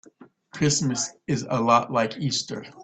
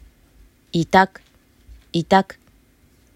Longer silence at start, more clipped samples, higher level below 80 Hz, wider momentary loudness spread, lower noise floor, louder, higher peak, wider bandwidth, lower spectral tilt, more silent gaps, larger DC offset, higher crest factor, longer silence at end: second, 0.2 s vs 0.75 s; neither; second, -60 dBFS vs -50 dBFS; about the same, 8 LU vs 10 LU; second, -52 dBFS vs -56 dBFS; second, -24 LUFS vs -19 LUFS; second, -6 dBFS vs -2 dBFS; second, 9.2 kHz vs 15 kHz; second, -4 dB/octave vs -6 dB/octave; neither; neither; about the same, 20 dB vs 22 dB; second, 0 s vs 0.95 s